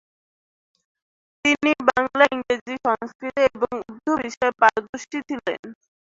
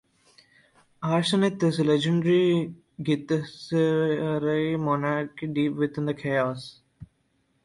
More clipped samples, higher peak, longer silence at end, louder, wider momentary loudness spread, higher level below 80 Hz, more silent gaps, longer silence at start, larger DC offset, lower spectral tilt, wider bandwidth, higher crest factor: neither; first, -2 dBFS vs -10 dBFS; second, 0.35 s vs 0.6 s; first, -22 LUFS vs -25 LUFS; first, 11 LU vs 8 LU; about the same, -60 dBFS vs -64 dBFS; first, 2.61-2.66 s, 3.15-3.19 s, 4.37-4.41 s, 4.89-4.93 s, 5.59-5.63 s vs none; first, 1.45 s vs 1 s; neither; second, -3.5 dB/octave vs -6.5 dB/octave; second, 7.8 kHz vs 11.5 kHz; first, 22 dB vs 16 dB